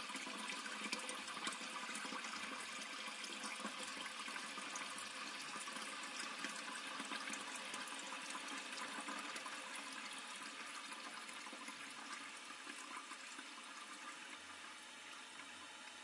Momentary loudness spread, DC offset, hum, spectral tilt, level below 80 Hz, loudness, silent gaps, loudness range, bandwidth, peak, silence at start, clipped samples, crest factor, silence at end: 7 LU; under 0.1%; none; -0.5 dB/octave; under -90 dBFS; -47 LUFS; none; 5 LU; 12 kHz; -28 dBFS; 0 s; under 0.1%; 22 dB; 0 s